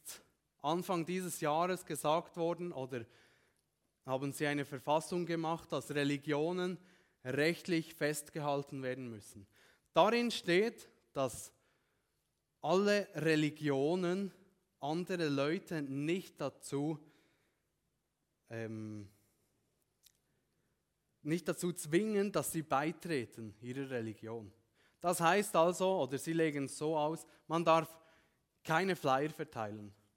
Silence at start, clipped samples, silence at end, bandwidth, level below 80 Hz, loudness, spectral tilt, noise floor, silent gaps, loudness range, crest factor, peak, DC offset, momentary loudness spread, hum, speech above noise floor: 0.05 s; under 0.1%; 0.25 s; 16.5 kHz; -78 dBFS; -36 LUFS; -5 dB/octave; -84 dBFS; none; 10 LU; 24 dB; -14 dBFS; under 0.1%; 15 LU; none; 48 dB